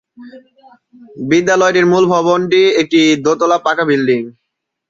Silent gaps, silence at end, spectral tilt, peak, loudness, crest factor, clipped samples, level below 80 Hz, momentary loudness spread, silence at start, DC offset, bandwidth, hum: none; 0.6 s; -5 dB/octave; -2 dBFS; -12 LUFS; 12 dB; under 0.1%; -58 dBFS; 5 LU; 0.2 s; under 0.1%; 7.8 kHz; none